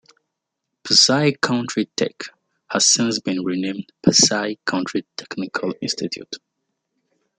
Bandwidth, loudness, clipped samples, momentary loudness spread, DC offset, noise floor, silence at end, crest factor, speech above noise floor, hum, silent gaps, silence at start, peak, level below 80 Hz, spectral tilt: 11 kHz; -19 LUFS; under 0.1%; 18 LU; under 0.1%; -80 dBFS; 1 s; 20 dB; 60 dB; none; none; 0.85 s; -2 dBFS; -64 dBFS; -2.5 dB/octave